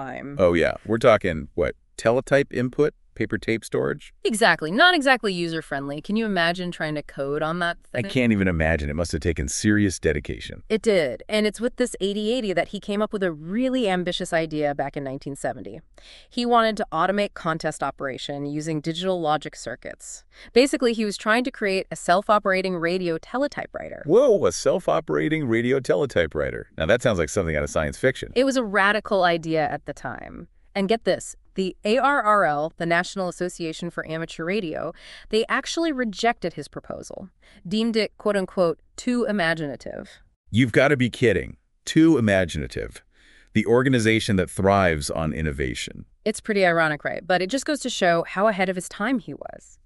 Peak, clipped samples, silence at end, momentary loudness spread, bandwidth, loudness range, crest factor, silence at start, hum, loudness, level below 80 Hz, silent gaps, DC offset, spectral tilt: -2 dBFS; under 0.1%; 0.3 s; 13 LU; 12 kHz; 5 LU; 20 dB; 0 s; none; -23 LUFS; -44 dBFS; 40.36-40.44 s; under 0.1%; -5 dB/octave